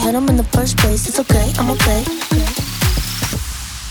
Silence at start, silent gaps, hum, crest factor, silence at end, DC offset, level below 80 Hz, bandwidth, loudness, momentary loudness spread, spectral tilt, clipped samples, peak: 0 s; none; none; 14 dB; 0 s; under 0.1%; -22 dBFS; over 20 kHz; -16 LUFS; 6 LU; -4.5 dB/octave; under 0.1%; -2 dBFS